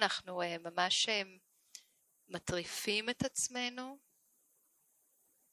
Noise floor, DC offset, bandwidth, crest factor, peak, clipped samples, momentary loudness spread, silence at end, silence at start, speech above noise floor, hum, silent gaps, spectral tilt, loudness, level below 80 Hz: -74 dBFS; under 0.1%; 16 kHz; 26 dB; -14 dBFS; under 0.1%; 21 LU; 1.55 s; 0 s; 37 dB; none; none; -2 dB/octave; -35 LUFS; -68 dBFS